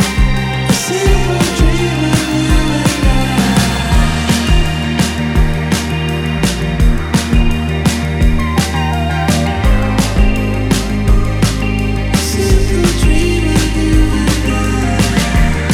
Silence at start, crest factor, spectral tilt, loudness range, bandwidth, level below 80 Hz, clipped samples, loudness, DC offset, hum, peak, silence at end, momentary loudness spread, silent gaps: 0 s; 10 dB; -5 dB/octave; 2 LU; 16.5 kHz; -16 dBFS; under 0.1%; -14 LUFS; under 0.1%; none; -2 dBFS; 0 s; 3 LU; none